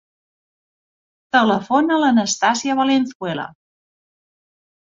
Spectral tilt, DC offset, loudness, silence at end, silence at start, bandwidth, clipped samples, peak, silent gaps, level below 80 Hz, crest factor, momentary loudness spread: -3.5 dB/octave; under 0.1%; -18 LUFS; 1.5 s; 1.35 s; 7.8 kHz; under 0.1%; -2 dBFS; 3.15-3.20 s; -64 dBFS; 18 dB; 10 LU